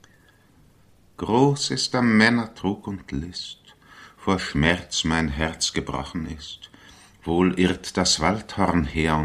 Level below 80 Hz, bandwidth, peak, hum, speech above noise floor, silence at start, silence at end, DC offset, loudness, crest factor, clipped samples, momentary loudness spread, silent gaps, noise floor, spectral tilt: -42 dBFS; 13.5 kHz; -2 dBFS; none; 33 dB; 1.2 s; 0 s; under 0.1%; -23 LUFS; 22 dB; under 0.1%; 14 LU; none; -56 dBFS; -4.5 dB/octave